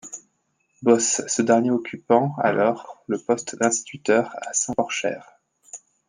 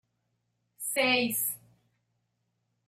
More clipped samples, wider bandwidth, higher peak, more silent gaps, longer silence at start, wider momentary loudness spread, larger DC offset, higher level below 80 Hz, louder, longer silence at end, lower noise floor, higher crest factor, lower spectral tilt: neither; second, 10.5 kHz vs 15.5 kHz; first, -2 dBFS vs -14 dBFS; neither; second, 0.05 s vs 0.8 s; first, 17 LU vs 13 LU; neither; first, -68 dBFS vs -78 dBFS; first, -22 LUFS vs -28 LUFS; second, 0.3 s vs 1.3 s; second, -70 dBFS vs -79 dBFS; about the same, 20 dB vs 20 dB; first, -4 dB/octave vs -1.5 dB/octave